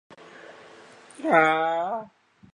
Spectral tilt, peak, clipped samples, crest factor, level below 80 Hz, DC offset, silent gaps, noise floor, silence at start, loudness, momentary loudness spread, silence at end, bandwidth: -5 dB/octave; -6 dBFS; under 0.1%; 22 dB; -74 dBFS; under 0.1%; none; -49 dBFS; 0.5 s; -23 LUFS; 26 LU; 0.5 s; 10.5 kHz